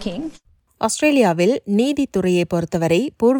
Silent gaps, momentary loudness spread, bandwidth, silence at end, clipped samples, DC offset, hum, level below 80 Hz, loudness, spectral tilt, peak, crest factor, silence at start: none; 10 LU; 18 kHz; 0 s; under 0.1%; under 0.1%; none; -50 dBFS; -18 LUFS; -5.5 dB/octave; -4 dBFS; 16 dB; 0 s